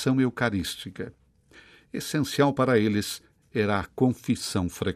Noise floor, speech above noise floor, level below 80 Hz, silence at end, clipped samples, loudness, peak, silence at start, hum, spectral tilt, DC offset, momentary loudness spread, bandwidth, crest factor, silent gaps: -55 dBFS; 30 dB; -58 dBFS; 0 s; under 0.1%; -26 LUFS; -8 dBFS; 0 s; none; -5.5 dB/octave; under 0.1%; 15 LU; 15 kHz; 20 dB; none